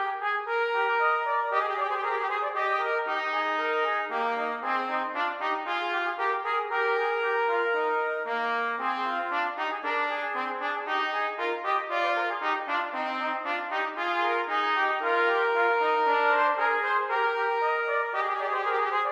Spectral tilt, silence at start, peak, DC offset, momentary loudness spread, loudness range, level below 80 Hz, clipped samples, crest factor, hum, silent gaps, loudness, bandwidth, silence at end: -2 dB/octave; 0 s; -12 dBFS; under 0.1%; 5 LU; 4 LU; -84 dBFS; under 0.1%; 16 dB; none; none; -27 LUFS; 8.8 kHz; 0 s